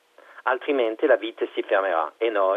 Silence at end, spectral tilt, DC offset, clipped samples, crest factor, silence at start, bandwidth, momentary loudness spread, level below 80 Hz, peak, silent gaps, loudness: 0 s; -4 dB/octave; under 0.1%; under 0.1%; 16 dB; 0.35 s; 4.7 kHz; 7 LU; -88 dBFS; -8 dBFS; none; -24 LUFS